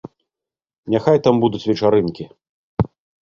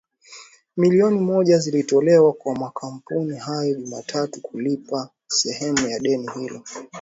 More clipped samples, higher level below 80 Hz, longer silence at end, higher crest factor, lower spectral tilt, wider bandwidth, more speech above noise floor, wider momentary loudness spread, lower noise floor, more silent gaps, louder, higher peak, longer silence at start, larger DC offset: neither; first, -44 dBFS vs -64 dBFS; first, 0.4 s vs 0 s; about the same, 18 dB vs 16 dB; first, -8 dB/octave vs -5 dB/octave; second, 7.2 kHz vs 8 kHz; first, 72 dB vs 25 dB; first, 19 LU vs 15 LU; first, -89 dBFS vs -46 dBFS; first, 2.49-2.77 s vs none; first, -18 LUFS vs -21 LUFS; about the same, -2 dBFS vs -4 dBFS; first, 0.85 s vs 0.3 s; neither